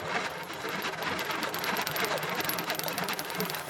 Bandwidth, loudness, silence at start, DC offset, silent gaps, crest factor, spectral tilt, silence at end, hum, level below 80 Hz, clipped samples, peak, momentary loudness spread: 19 kHz; -31 LUFS; 0 s; under 0.1%; none; 24 dB; -2.5 dB/octave; 0 s; none; -66 dBFS; under 0.1%; -8 dBFS; 3 LU